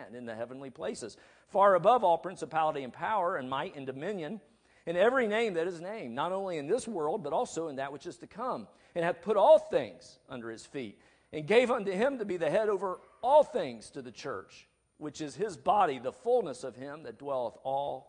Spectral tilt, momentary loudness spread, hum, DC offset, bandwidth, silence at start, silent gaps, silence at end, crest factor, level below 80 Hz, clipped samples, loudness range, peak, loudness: -5 dB/octave; 18 LU; none; under 0.1%; 10.5 kHz; 0 s; none; 0.05 s; 20 dB; -72 dBFS; under 0.1%; 4 LU; -10 dBFS; -30 LUFS